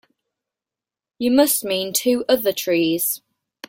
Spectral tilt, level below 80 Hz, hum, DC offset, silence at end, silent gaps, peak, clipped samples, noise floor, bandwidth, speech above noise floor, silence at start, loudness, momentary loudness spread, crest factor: -3 dB/octave; -64 dBFS; none; under 0.1%; 0.5 s; none; -4 dBFS; under 0.1%; -89 dBFS; 17 kHz; 70 dB; 1.2 s; -19 LUFS; 6 LU; 18 dB